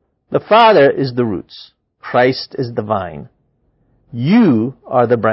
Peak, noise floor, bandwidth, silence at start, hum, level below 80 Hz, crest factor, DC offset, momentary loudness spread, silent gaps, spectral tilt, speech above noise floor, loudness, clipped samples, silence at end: 0 dBFS; -60 dBFS; 5.8 kHz; 0.3 s; none; -52 dBFS; 14 dB; under 0.1%; 19 LU; none; -9 dB/octave; 47 dB; -14 LUFS; under 0.1%; 0 s